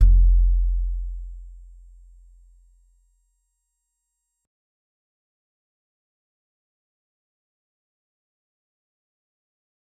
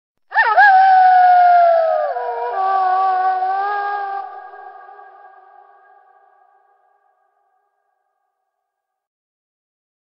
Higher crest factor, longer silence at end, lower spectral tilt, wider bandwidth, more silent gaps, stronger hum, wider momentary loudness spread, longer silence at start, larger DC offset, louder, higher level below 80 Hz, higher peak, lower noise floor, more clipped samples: first, 22 dB vs 16 dB; first, 8.45 s vs 5.35 s; first, -9 dB/octave vs -2 dB/octave; second, 0.5 kHz vs 5.6 kHz; neither; neither; first, 25 LU vs 16 LU; second, 0 s vs 0.3 s; neither; second, -23 LUFS vs -14 LUFS; first, -26 dBFS vs -90 dBFS; about the same, -4 dBFS vs -2 dBFS; about the same, -78 dBFS vs -78 dBFS; neither